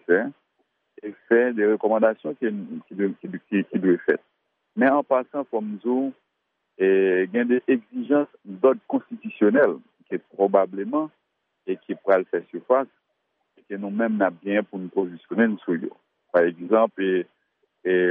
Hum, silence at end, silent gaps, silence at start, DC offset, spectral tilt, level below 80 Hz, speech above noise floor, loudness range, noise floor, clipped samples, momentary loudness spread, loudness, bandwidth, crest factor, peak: none; 0 s; none; 0.1 s; under 0.1%; -5.5 dB/octave; -80 dBFS; 54 dB; 3 LU; -77 dBFS; under 0.1%; 13 LU; -23 LUFS; 3.7 kHz; 18 dB; -4 dBFS